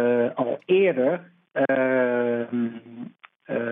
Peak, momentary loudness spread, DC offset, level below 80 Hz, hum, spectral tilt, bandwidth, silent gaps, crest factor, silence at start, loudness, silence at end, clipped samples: -10 dBFS; 17 LU; under 0.1%; -82 dBFS; none; -10 dB/octave; 3.8 kHz; 3.36-3.40 s; 14 dB; 0 s; -24 LUFS; 0 s; under 0.1%